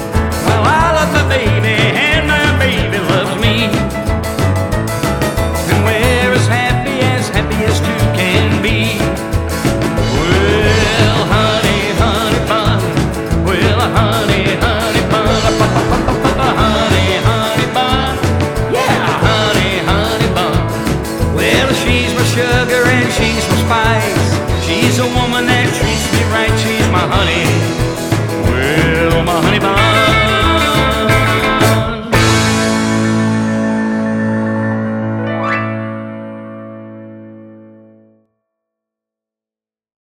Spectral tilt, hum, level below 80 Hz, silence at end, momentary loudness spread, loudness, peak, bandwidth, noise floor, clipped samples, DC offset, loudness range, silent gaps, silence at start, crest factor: -5 dB/octave; none; -26 dBFS; 2.5 s; 5 LU; -13 LUFS; 0 dBFS; 18.5 kHz; under -90 dBFS; under 0.1%; under 0.1%; 4 LU; none; 0 s; 12 dB